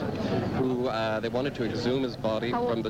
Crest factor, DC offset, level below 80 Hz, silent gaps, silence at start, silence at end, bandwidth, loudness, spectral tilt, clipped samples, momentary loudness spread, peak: 12 dB; under 0.1%; -52 dBFS; none; 0 s; 0 s; 16 kHz; -29 LUFS; -7 dB/octave; under 0.1%; 2 LU; -16 dBFS